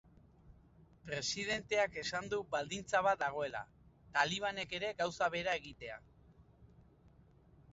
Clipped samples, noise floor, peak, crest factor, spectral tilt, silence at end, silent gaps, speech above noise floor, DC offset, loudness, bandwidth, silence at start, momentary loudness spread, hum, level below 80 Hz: under 0.1%; -65 dBFS; -16 dBFS; 22 dB; -1.5 dB/octave; 0.95 s; none; 27 dB; under 0.1%; -37 LUFS; 7.6 kHz; 0.45 s; 14 LU; none; -66 dBFS